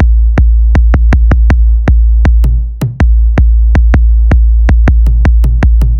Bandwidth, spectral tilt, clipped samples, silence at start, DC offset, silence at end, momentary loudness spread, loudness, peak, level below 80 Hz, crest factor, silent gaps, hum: 3 kHz; -8.5 dB/octave; under 0.1%; 0 s; under 0.1%; 0 s; 2 LU; -9 LUFS; 0 dBFS; -6 dBFS; 6 dB; none; none